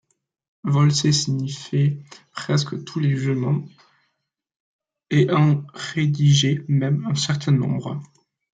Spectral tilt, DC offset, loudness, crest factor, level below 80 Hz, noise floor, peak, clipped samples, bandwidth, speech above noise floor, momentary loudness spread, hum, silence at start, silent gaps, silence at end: -5.5 dB/octave; under 0.1%; -21 LUFS; 16 dB; -60 dBFS; -77 dBFS; -6 dBFS; under 0.1%; 9.2 kHz; 57 dB; 11 LU; none; 0.65 s; 4.60-4.79 s; 0.55 s